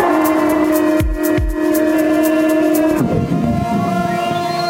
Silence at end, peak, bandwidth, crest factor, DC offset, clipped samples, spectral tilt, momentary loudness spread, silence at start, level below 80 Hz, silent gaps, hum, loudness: 0 s; -2 dBFS; 17 kHz; 14 dB; under 0.1%; under 0.1%; -6 dB/octave; 4 LU; 0 s; -28 dBFS; none; none; -15 LUFS